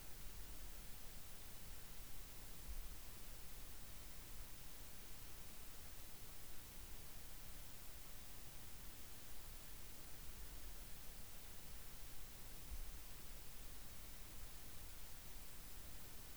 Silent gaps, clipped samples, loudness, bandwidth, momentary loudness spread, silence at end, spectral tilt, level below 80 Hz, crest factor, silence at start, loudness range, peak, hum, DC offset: none; under 0.1%; -54 LUFS; over 20 kHz; 1 LU; 0 s; -2.5 dB/octave; -58 dBFS; 14 dB; 0 s; 0 LU; -38 dBFS; none; 0.2%